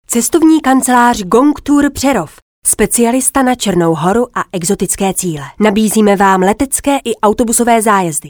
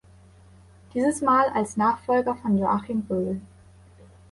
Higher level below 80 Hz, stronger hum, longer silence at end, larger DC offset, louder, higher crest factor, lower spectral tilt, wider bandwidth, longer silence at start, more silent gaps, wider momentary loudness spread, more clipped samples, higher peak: first, -38 dBFS vs -56 dBFS; neither; second, 0 s vs 0.85 s; neither; first, -11 LUFS vs -24 LUFS; about the same, 12 dB vs 16 dB; second, -4 dB/octave vs -6.5 dB/octave; first, over 20 kHz vs 11.5 kHz; second, 0.1 s vs 0.95 s; first, 2.42-2.62 s vs none; about the same, 6 LU vs 8 LU; neither; first, 0 dBFS vs -10 dBFS